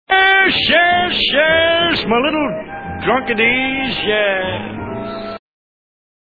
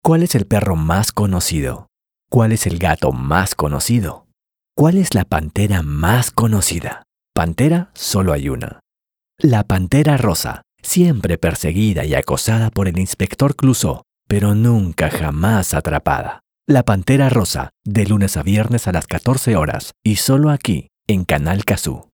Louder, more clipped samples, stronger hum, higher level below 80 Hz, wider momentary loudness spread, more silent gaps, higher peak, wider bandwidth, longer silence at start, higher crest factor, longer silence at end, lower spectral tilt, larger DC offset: first, -14 LUFS vs -17 LUFS; neither; neither; second, -44 dBFS vs -32 dBFS; first, 15 LU vs 7 LU; neither; about the same, 0 dBFS vs 0 dBFS; second, 4.9 kHz vs over 20 kHz; about the same, 0.1 s vs 0.05 s; about the same, 16 dB vs 16 dB; first, 1 s vs 0.15 s; about the same, -6 dB/octave vs -5.5 dB/octave; first, 0.3% vs under 0.1%